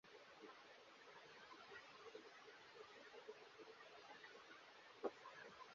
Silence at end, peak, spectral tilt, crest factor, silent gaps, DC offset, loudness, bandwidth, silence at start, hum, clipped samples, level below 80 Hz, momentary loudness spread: 0 s; -32 dBFS; -0.5 dB/octave; 28 dB; none; under 0.1%; -60 LUFS; 7.2 kHz; 0.05 s; none; under 0.1%; under -90 dBFS; 10 LU